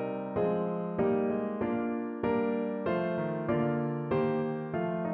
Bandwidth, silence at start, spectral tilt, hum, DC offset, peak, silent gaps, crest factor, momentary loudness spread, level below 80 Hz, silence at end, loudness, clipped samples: 4.5 kHz; 0 s; -7.5 dB/octave; none; under 0.1%; -16 dBFS; none; 14 dB; 4 LU; -62 dBFS; 0 s; -31 LUFS; under 0.1%